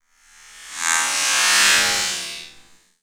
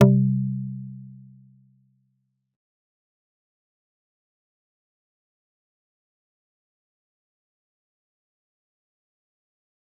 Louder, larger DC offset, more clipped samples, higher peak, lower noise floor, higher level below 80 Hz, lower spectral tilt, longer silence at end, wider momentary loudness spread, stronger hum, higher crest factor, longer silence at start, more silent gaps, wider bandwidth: first, -16 LUFS vs -24 LUFS; neither; neither; about the same, 0 dBFS vs -2 dBFS; second, -50 dBFS vs -74 dBFS; first, -58 dBFS vs -72 dBFS; second, 2 dB/octave vs -10 dB/octave; second, 0.5 s vs 8.9 s; second, 18 LU vs 23 LU; neither; second, 22 dB vs 28 dB; first, 0.55 s vs 0 s; neither; first, over 20 kHz vs 3.4 kHz